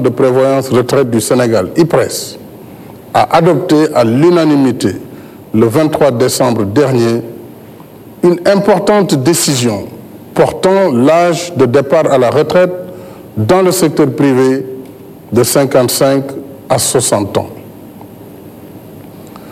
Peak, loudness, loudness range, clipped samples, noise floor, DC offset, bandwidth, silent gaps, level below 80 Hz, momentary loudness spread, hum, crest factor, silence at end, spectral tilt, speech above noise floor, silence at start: 0 dBFS; -11 LUFS; 2 LU; under 0.1%; -33 dBFS; under 0.1%; 16 kHz; none; -48 dBFS; 16 LU; none; 12 dB; 0 s; -5 dB/octave; 24 dB; 0 s